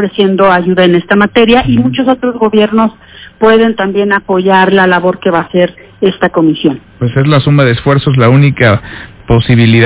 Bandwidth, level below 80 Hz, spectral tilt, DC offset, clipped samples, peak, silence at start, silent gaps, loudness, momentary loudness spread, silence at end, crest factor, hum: 4 kHz; -34 dBFS; -11 dB/octave; under 0.1%; 2%; 0 dBFS; 0 s; none; -9 LUFS; 7 LU; 0 s; 8 dB; none